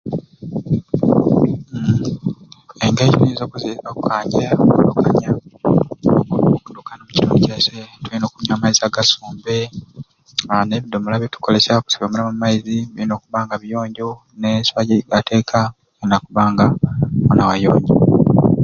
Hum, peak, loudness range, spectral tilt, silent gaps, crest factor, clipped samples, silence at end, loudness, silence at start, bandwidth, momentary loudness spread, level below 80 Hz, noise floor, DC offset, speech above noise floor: none; 0 dBFS; 3 LU; -5.5 dB/octave; none; 16 dB; under 0.1%; 0 s; -17 LUFS; 0.05 s; 7.4 kHz; 12 LU; -44 dBFS; -38 dBFS; under 0.1%; 22 dB